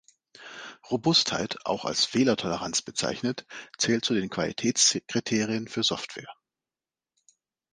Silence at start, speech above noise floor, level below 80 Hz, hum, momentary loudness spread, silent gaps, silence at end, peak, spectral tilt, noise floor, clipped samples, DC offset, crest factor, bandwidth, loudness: 0.4 s; over 63 dB; -64 dBFS; none; 17 LU; none; 1.4 s; -8 dBFS; -3 dB/octave; under -90 dBFS; under 0.1%; under 0.1%; 20 dB; 10.5 kHz; -26 LUFS